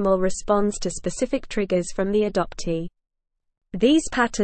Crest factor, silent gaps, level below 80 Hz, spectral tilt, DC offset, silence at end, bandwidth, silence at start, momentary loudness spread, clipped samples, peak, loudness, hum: 16 dB; none; -42 dBFS; -5 dB/octave; under 0.1%; 0 s; 8.8 kHz; 0 s; 9 LU; under 0.1%; -6 dBFS; -23 LUFS; none